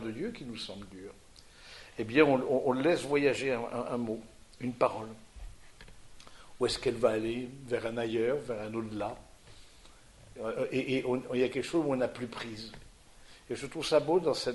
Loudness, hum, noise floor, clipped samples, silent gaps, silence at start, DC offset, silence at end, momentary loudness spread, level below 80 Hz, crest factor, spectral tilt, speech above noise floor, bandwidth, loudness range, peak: -32 LUFS; none; -55 dBFS; under 0.1%; none; 0 s; under 0.1%; 0 s; 19 LU; -58 dBFS; 22 dB; -5 dB/octave; 24 dB; 11.5 kHz; 6 LU; -12 dBFS